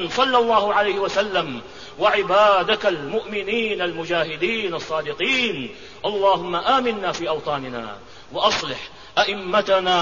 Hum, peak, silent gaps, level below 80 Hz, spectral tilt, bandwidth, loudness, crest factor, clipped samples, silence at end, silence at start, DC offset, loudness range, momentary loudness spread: none; -4 dBFS; none; -54 dBFS; -3.5 dB/octave; 7.4 kHz; -21 LUFS; 16 dB; under 0.1%; 0 s; 0 s; 0.5%; 3 LU; 13 LU